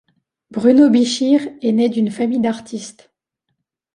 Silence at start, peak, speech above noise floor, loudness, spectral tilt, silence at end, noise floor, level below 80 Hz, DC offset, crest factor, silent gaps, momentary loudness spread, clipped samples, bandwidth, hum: 0.55 s; -2 dBFS; 59 dB; -16 LUFS; -5.5 dB/octave; 1.05 s; -75 dBFS; -62 dBFS; under 0.1%; 16 dB; none; 18 LU; under 0.1%; 11 kHz; none